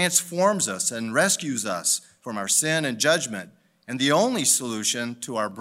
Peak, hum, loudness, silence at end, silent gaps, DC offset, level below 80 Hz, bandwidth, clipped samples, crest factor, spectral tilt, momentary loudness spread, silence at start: -6 dBFS; none; -23 LUFS; 0 s; none; under 0.1%; -74 dBFS; 16 kHz; under 0.1%; 18 dB; -2 dB/octave; 9 LU; 0 s